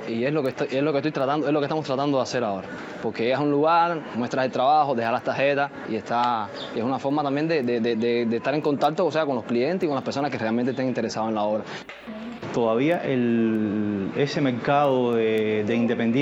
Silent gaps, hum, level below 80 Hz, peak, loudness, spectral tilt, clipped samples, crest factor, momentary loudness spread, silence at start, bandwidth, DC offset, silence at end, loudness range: none; none; -68 dBFS; -8 dBFS; -24 LUFS; -6.5 dB/octave; under 0.1%; 14 dB; 8 LU; 0 s; 8 kHz; under 0.1%; 0 s; 3 LU